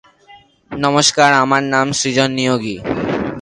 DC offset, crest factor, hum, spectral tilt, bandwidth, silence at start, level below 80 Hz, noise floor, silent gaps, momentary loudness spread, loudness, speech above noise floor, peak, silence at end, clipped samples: under 0.1%; 16 dB; none; -3.5 dB/octave; 11.5 kHz; 0.3 s; -48 dBFS; -46 dBFS; none; 10 LU; -15 LUFS; 31 dB; 0 dBFS; 0 s; under 0.1%